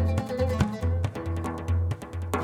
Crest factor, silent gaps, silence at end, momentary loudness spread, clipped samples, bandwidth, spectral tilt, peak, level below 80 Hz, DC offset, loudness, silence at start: 20 dB; none; 0 s; 5 LU; under 0.1%; 13 kHz; -7.5 dB/octave; -8 dBFS; -36 dBFS; under 0.1%; -29 LUFS; 0 s